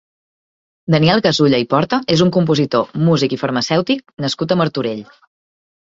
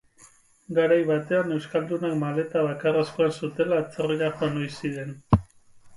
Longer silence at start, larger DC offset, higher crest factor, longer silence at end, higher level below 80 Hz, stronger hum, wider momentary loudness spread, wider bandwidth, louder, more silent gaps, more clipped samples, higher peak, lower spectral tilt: first, 0.9 s vs 0.7 s; neither; second, 16 dB vs 22 dB; first, 0.8 s vs 0 s; second, -52 dBFS vs -46 dBFS; neither; first, 9 LU vs 6 LU; second, 7.8 kHz vs 11.5 kHz; first, -16 LUFS vs -25 LUFS; neither; neither; first, 0 dBFS vs -4 dBFS; about the same, -6 dB/octave vs -7 dB/octave